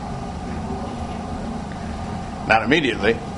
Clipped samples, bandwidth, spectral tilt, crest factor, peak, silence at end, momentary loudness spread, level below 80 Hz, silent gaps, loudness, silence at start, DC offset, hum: under 0.1%; 11 kHz; -5.5 dB/octave; 24 dB; 0 dBFS; 0 s; 13 LU; -36 dBFS; none; -23 LUFS; 0 s; under 0.1%; none